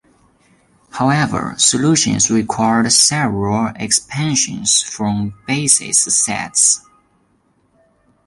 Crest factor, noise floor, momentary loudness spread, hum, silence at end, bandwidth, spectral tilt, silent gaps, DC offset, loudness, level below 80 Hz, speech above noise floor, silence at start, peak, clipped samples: 18 dB; -59 dBFS; 8 LU; none; 1.45 s; 11.5 kHz; -2.5 dB/octave; none; under 0.1%; -14 LUFS; -48 dBFS; 44 dB; 0.95 s; 0 dBFS; under 0.1%